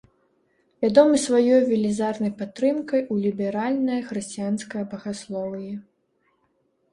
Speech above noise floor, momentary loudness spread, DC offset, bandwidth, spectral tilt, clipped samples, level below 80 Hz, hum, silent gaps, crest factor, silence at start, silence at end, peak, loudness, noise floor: 46 dB; 14 LU; under 0.1%; 11.5 kHz; -5.5 dB/octave; under 0.1%; -66 dBFS; none; none; 20 dB; 0.8 s; 1.1 s; -4 dBFS; -23 LUFS; -69 dBFS